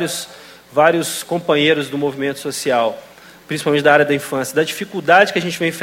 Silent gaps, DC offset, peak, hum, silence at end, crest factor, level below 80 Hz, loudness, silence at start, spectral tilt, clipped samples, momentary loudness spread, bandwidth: none; under 0.1%; 0 dBFS; none; 0 s; 18 dB; -62 dBFS; -17 LUFS; 0 s; -4 dB/octave; under 0.1%; 10 LU; 16.5 kHz